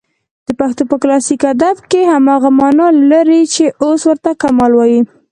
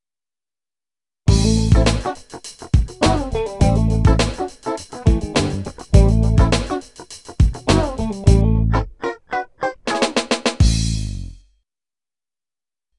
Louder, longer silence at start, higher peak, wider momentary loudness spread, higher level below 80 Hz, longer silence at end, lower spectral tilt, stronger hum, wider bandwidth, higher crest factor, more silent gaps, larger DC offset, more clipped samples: first, -10 LUFS vs -19 LUFS; second, 0.5 s vs 1.25 s; about the same, 0 dBFS vs 0 dBFS; second, 6 LU vs 13 LU; second, -50 dBFS vs -22 dBFS; second, 0.25 s vs 1.65 s; second, -4 dB/octave vs -6 dB/octave; neither; about the same, 10.5 kHz vs 11 kHz; second, 10 dB vs 18 dB; neither; second, under 0.1% vs 0.2%; neither